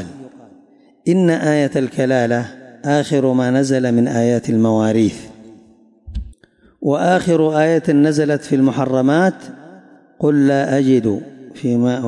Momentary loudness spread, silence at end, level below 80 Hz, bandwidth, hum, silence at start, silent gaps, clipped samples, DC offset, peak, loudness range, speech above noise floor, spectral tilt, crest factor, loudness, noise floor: 14 LU; 0 s; -44 dBFS; 11.5 kHz; none; 0 s; none; under 0.1%; under 0.1%; -4 dBFS; 3 LU; 36 dB; -7 dB/octave; 12 dB; -16 LUFS; -51 dBFS